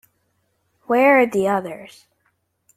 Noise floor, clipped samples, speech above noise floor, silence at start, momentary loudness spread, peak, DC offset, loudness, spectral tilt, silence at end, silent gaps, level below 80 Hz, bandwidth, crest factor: -68 dBFS; under 0.1%; 51 dB; 0.9 s; 19 LU; -4 dBFS; under 0.1%; -17 LUFS; -6 dB/octave; 0.9 s; none; -66 dBFS; 15 kHz; 18 dB